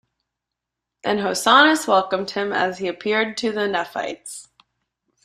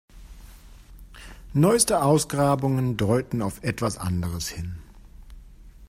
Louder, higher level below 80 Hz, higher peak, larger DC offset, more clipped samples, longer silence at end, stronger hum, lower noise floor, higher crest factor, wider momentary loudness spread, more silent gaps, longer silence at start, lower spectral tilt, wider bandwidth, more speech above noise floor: first, -20 LUFS vs -23 LUFS; second, -64 dBFS vs -46 dBFS; about the same, -2 dBFS vs -4 dBFS; neither; neither; first, 0.8 s vs 0.05 s; neither; first, -84 dBFS vs -46 dBFS; about the same, 20 dB vs 20 dB; second, 16 LU vs 19 LU; neither; first, 1.05 s vs 0.15 s; second, -3 dB/octave vs -5.5 dB/octave; about the same, 15 kHz vs 16 kHz; first, 64 dB vs 23 dB